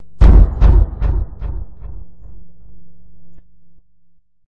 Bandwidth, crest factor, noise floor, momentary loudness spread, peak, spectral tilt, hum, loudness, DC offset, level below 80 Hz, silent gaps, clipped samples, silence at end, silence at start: 4 kHz; 14 dB; -53 dBFS; 26 LU; 0 dBFS; -9.5 dB/octave; none; -15 LUFS; 3%; -16 dBFS; none; under 0.1%; 0.15 s; 0 s